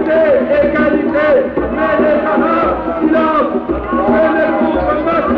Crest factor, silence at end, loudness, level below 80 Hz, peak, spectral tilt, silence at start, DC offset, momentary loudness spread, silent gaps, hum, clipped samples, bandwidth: 10 dB; 0 s; -13 LUFS; -34 dBFS; -4 dBFS; -8.5 dB/octave; 0 s; under 0.1%; 4 LU; none; none; under 0.1%; 5.4 kHz